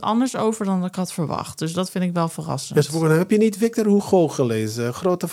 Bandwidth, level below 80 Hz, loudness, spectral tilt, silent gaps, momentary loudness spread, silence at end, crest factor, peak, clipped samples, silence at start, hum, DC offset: 16 kHz; -64 dBFS; -21 LUFS; -6 dB/octave; none; 8 LU; 0 s; 16 dB; -4 dBFS; under 0.1%; 0 s; none; under 0.1%